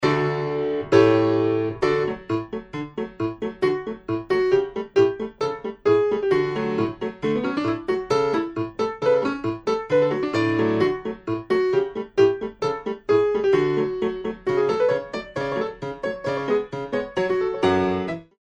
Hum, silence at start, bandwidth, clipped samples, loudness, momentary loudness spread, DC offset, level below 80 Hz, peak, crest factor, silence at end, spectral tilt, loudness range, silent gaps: none; 0 s; 8.4 kHz; under 0.1%; -23 LUFS; 9 LU; under 0.1%; -54 dBFS; -2 dBFS; 20 dB; 0.15 s; -7 dB/octave; 3 LU; none